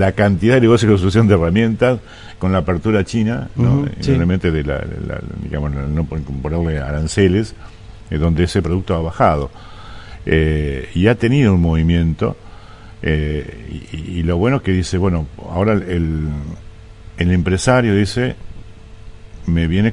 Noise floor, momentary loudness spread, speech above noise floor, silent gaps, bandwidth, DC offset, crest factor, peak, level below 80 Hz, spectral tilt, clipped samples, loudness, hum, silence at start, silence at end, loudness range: -36 dBFS; 14 LU; 21 dB; none; 11 kHz; under 0.1%; 16 dB; 0 dBFS; -32 dBFS; -7 dB/octave; under 0.1%; -17 LUFS; none; 0 s; 0 s; 4 LU